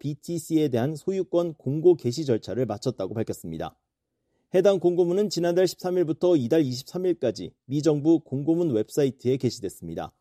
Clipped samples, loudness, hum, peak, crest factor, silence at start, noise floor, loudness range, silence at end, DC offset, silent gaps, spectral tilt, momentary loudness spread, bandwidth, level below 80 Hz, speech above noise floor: under 0.1%; -25 LUFS; none; -8 dBFS; 16 dB; 0.05 s; -79 dBFS; 3 LU; 0.1 s; under 0.1%; none; -6.5 dB/octave; 11 LU; 14.5 kHz; -62 dBFS; 55 dB